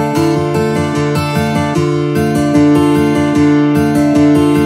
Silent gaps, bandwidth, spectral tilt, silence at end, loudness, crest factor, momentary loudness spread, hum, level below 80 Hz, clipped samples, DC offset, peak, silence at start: none; 15 kHz; -7 dB/octave; 0 s; -12 LUFS; 10 dB; 5 LU; none; -38 dBFS; under 0.1%; under 0.1%; 0 dBFS; 0 s